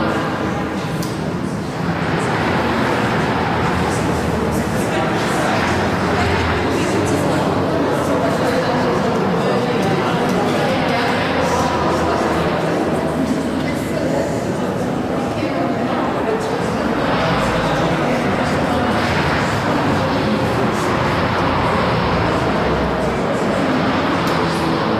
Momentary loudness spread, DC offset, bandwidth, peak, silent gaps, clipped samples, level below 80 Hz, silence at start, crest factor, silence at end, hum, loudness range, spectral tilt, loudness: 3 LU; under 0.1%; 15.5 kHz; -6 dBFS; none; under 0.1%; -36 dBFS; 0 s; 12 dB; 0 s; none; 2 LU; -6 dB/octave; -18 LUFS